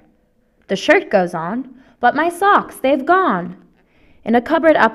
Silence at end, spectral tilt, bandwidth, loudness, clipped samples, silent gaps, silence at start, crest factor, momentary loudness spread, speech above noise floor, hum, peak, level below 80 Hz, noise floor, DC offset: 0 s; -5.5 dB/octave; 13 kHz; -16 LUFS; under 0.1%; none; 0.7 s; 16 dB; 12 LU; 43 dB; none; 0 dBFS; -54 dBFS; -58 dBFS; under 0.1%